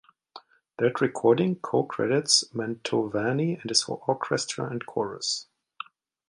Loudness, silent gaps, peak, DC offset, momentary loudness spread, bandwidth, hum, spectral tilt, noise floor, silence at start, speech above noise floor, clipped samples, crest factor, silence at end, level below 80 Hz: -26 LUFS; none; -6 dBFS; under 0.1%; 10 LU; 11.5 kHz; none; -3.5 dB/octave; -51 dBFS; 0.35 s; 25 dB; under 0.1%; 22 dB; 0.85 s; -70 dBFS